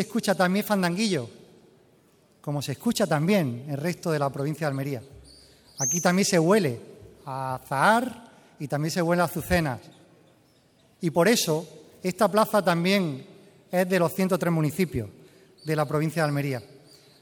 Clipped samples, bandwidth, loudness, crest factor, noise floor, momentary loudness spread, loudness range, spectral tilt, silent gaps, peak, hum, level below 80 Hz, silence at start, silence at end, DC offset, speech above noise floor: under 0.1%; 19.5 kHz; -25 LUFS; 20 dB; -61 dBFS; 15 LU; 3 LU; -5 dB/octave; none; -6 dBFS; none; -54 dBFS; 0 s; 0.55 s; under 0.1%; 36 dB